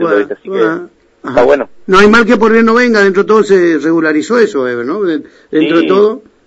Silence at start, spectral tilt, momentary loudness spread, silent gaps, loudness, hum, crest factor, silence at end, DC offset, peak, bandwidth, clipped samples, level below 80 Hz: 0 s; -5.5 dB/octave; 9 LU; none; -10 LUFS; none; 10 dB; 0.25 s; under 0.1%; 0 dBFS; 8.2 kHz; 0.4%; -44 dBFS